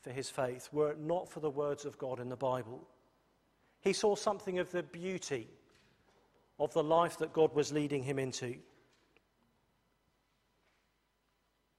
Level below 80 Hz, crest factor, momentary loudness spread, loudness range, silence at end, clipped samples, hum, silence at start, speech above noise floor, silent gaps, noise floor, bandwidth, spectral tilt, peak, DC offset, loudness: -76 dBFS; 22 dB; 11 LU; 6 LU; 3.15 s; under 0.1%; none; 0.05 s; 43 dB; none; -78 dBFS; 14 kHz; -5 dB/octave; -16 dBFS; under 0.1%; -36 LUFS